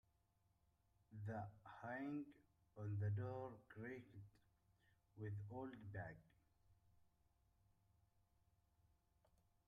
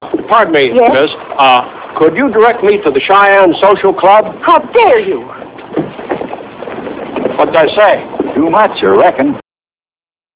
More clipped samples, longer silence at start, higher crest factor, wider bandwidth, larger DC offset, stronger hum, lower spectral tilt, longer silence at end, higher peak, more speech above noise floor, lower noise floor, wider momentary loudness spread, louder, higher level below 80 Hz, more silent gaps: second, under 0.1% vs 1%; first, 1.1 s vs 0 s; first, 18 dB vs 10 dB; first, 5 kHz vs 4 kHz; neither; neither; about the same, -9.5 dB/octave vs -8.5 dB/octave; first, 2.95 s vs 0.95 s; second, -36 dBFS vs 0 dBFS; second, 33 dB vs over 82 dB; second, -83 dBFS vs under -90 dBFS; first, 18 LU vs 14 LU; second, -52 LUFS vs -9 LUFS; second, -80 dBFS vs -48 dBFS; neither